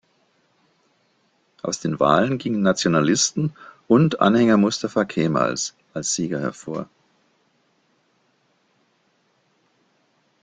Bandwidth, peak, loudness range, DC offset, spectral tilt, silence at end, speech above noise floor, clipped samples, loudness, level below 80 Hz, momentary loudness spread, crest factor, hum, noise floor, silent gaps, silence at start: 9.6 kHz; -2 dBFS; 12 LU; under 0.1%; -4.5 dB/octave; 3.6 s; 45 dB; under 0.1%; -21 LUFS; -60 dBFS; 12 LU; 20 dB; none; -65 dBFS; none; 1.65 s